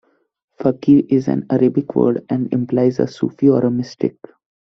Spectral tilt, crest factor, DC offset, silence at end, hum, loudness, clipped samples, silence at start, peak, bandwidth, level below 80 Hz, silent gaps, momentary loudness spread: -9 dB/octave; 16 dB; under 0.1%; 0.55 s; none; -17 LUFS; under 0.1%; 0.6 s; -2 dBFS; 6.4 kHz; -56 dBFS; none; 8 LU